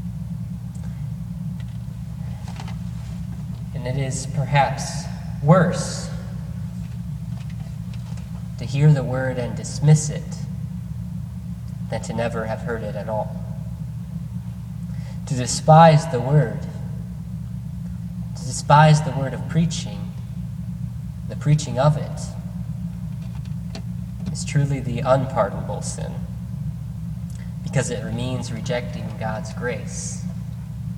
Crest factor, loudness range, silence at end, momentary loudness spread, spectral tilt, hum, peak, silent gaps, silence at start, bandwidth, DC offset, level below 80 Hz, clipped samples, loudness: 22 dB; 9 LU; 0 s; 14 LU; -6 dB/octave; none; 0 dBFS; none; 0 s; 12 kHz; under 0.1%; -40 dBFS; under 0.1%; -24 LUFS